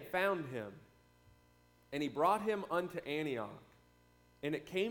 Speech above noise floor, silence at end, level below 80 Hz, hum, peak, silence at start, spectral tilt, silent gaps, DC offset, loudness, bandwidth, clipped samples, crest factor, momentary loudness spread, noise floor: 31 dB; 0 s; -72 dBFS; 60 Hz at -70 dBFS; -20 dBFS; 0 s; -5.5 dB/octave; none; under 0.1%; -38 LUFS; 19 kHz; under 0.1%; 20 dB; 13 LU; -68 dBFS